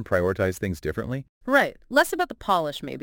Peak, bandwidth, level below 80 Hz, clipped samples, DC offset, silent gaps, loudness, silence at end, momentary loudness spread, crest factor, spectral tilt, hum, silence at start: -4 dBFS; 17 kHz; -48 dBFS; under 0.1%; under 0.1%; 1.29-1.41 s; -25 LUFS; 0 s; 9 LU; 20 dB; -5 dB/octave; none; 0 s